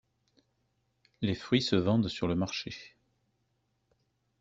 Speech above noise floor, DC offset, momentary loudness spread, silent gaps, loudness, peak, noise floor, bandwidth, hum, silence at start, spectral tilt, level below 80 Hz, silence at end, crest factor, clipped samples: 47 dB; under 0.1%; 11 LU; none; -30 LUFS; -12 dBFS; -77 dBFS; 8 kHz; none; 1.2 s; -6 dB/octave; -62 dBFS; 1.55 s; 22 dB; under 0.1%